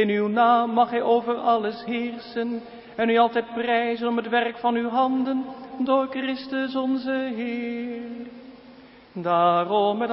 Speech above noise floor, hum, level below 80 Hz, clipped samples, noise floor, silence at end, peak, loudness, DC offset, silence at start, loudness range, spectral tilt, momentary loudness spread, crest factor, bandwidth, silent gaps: 25 dB; none; -66 dBFS; under 0.1%; -48 dBFS; 0 s; -6 dBFS; -24 LUFS; under 0.1%; 0 s; 4 LU; -10 dB/octave; 12 LU; 18 dB; 5.8 kHz; none